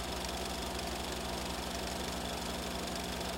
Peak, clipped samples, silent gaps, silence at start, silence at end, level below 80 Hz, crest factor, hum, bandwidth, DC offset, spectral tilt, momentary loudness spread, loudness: -24 dBFS; under 0.1%; none; 0 s; 0 s; -48 dBFS; 14 dB; 60 Hz at -45 dBFS; 17 kHz; under 0.1%; -3.5 dB/octave; 0 LU; -38 LUFS